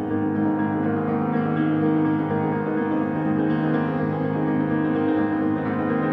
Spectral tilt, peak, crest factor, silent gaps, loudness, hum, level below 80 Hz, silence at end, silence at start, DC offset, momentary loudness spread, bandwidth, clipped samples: -10.5 dB/octave; -10 dBFS; 12 dB; none; -23 LUFS; none; -58 dBFS; 0 s; 0 s; under 0.1%; 3 LU; 4.3 kHz; under 0.1%